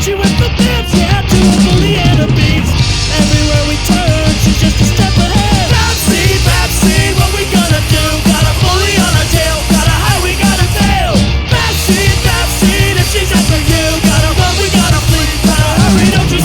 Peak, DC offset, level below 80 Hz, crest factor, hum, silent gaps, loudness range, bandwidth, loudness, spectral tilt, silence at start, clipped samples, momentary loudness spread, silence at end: 0 dBFS; under 0.1%; -18 dBFS; 10 dB; none; none; 1 LU; over 20 kHz; -10 LUFS; -4.5 dB/octave; 0 s; under 0.1%; 2 LU; 0 s